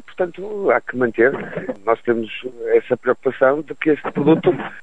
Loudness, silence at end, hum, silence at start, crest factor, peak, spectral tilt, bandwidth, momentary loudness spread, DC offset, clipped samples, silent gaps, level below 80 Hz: -19 LUFS; 0 s; none; 0.1 s; 16 dB; -2 dBFS; -8.5 dB/octave; 7.8 kHz; 9 LU; 0.9%; under 0.1%; none; -56 dBFS